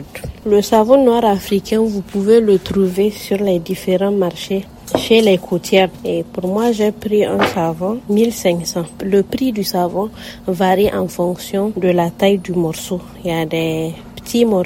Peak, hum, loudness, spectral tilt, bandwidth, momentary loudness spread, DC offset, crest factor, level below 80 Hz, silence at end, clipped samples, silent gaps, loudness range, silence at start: 0 dBFS; none; -16 LUFS; -5.5 dB/octave; 16.5 kHz; 11 LU; under 0.1%; 16 dB; -44 dBFS; 0 s; under 0.1%; none; 4 LU; 0 s